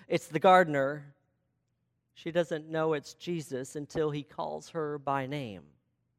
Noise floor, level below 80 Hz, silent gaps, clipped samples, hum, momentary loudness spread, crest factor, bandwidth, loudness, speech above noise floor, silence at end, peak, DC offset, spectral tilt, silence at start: -79 dBFS; -70 dBFS; none; under 0.1%; none; 16 LU; 24 dB; 15.5 kHz; -30 LUFS; 48 dB; 0.55 s; -8 dBFS; under 0.1%; -5.5 dB/octave; 0.1 s